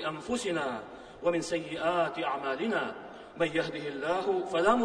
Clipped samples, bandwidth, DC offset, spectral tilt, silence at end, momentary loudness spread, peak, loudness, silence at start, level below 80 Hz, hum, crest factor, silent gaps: under 0.1%; 10.5 kHz; under 0.1%; -4.5 dB/octave; 0 s; 8 LU; -10 dBFS; -31 LUFS; 0 s; -64 dBFS; none; 20 dB; none